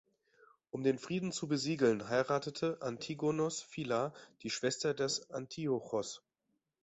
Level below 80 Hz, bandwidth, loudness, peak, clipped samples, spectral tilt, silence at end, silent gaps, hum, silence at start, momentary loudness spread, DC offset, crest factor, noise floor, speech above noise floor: -74 dBFS; 8.2 kHz; -36 LUFS; -18 dBFS; under 0.1%; -4.5 dB/octave; 0.65 s; none; none; 0.75 s; 9 LU; under 0.1%; 20 dB; -84 dBFS; 48 dB